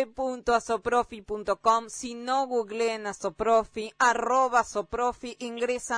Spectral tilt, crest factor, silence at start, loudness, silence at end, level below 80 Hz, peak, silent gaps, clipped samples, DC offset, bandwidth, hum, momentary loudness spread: -3 dB/octave; 18 dB; 0 s; -27 LUFS; 0 s; -56 dBFS; -10 dBFS; none; under 0.1%; under 0.1%; 10.5 kHz; none; 11 LU